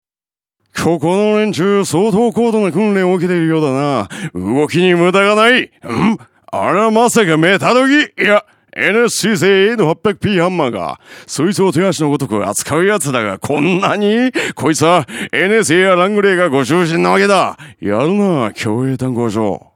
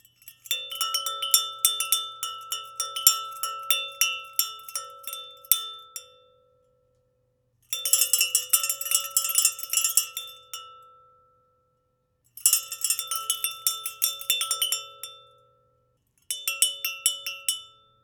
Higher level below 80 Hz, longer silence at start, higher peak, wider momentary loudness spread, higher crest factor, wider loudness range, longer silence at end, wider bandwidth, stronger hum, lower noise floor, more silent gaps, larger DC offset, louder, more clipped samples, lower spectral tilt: first, -54 dBFS vs -82 dBFS; first, 0.75 s vs 0.25 s; about the same, 0 dBFS vs 0 dBFS; second, 8 LU vs 16 LU; second, 14 dB vs 30 dB; second, 3 LU vs 6 LU; second, 0.2 s vs 0.35 s; second, 17.5 kHz vs over 20 kHz; neither; first, under -90 dBFS vs -72 dBFS; neither; neither; first, -13 LUFS vs -24 LUFS; neither; first, -5 dB/octave vs 5 dB/octave